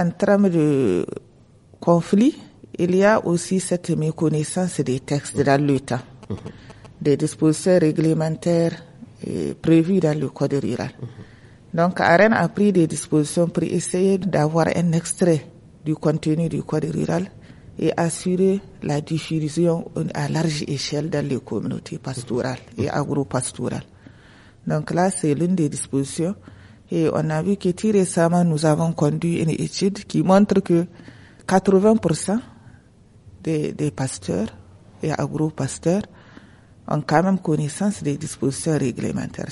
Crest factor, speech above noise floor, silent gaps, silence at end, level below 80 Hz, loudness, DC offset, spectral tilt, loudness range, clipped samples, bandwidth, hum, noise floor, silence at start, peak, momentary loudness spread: 18 dB; 30 dB; none; 0 s; -54 dBFS; -21 LUFS; under 0.1%; -6 dB/octave; 6 LU; under 0.1%; 11.5 kHz; none; -51 dBFS; 0 s; -2 dBFS; 11 LU